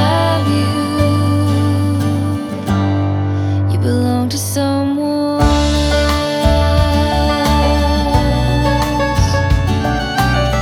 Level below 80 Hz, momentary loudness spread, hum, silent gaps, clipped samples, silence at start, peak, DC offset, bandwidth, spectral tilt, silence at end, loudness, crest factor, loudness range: -22 dBFS; 3 LU; none; none; under 0.1%; 0 s; 0 dBFS; under 0.1%; 16 kHz; -6 dB/octave; 0 s; -15 LUFS; 14 dB; 2 LU